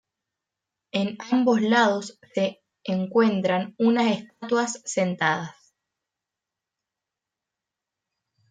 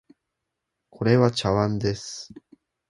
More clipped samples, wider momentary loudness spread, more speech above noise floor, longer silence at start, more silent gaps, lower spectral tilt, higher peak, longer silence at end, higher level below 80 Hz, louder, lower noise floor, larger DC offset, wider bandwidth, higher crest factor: neither; second, 11 LU vs 17 LU; first, 64 dB vs 59 dB; about the same, 0.95 s vs 1 s; neither; about the same, -5 dB/octave vs -6 dB/octave; second, -8 dBFS vs -4 dBFS; first, 3 s vs 0.65 s; second, -74 dBFS vs -52 dBFS; about the same, -24 LUFS vs -23 LUFS; first, -87 dBFS vs -82 dBFS; neither; second, 9.4 kHz vs 11.5 kHz; about the same, 18 dB vs 22 dB